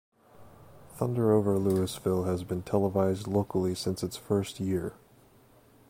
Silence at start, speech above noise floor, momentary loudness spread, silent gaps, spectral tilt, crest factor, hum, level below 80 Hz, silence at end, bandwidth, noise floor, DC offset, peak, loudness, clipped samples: 0.4 s; 31 dB; 8 LU; none; -7 dB/octave; 18 dB; none; -58 dBFS; 0.95 s; 16.5 kHz; -59 dBFS; under 0.1%; -12 dBFS; -29 LUFS; under 0.1%